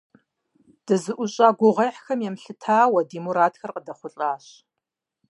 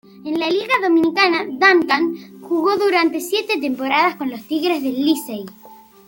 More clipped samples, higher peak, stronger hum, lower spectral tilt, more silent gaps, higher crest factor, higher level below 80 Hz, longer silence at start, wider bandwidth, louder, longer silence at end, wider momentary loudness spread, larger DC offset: neither; about the same, -4 dBFS vs -2 dBFS; neither; first, -5.5 dB/octave vs -3.5 dB/octave; neither; about the same, 20 dB vs 18 dB; second, -80 dBFS vs -66 dBFS; first, 0.9 s vs 0.15 s; second, 11.5 kHz vs 17 kHz; second, -22 LUFS vs -18 LUFS; first, 0.95 s vs 0.35 s; first, 16 LU vs 11 LU; neither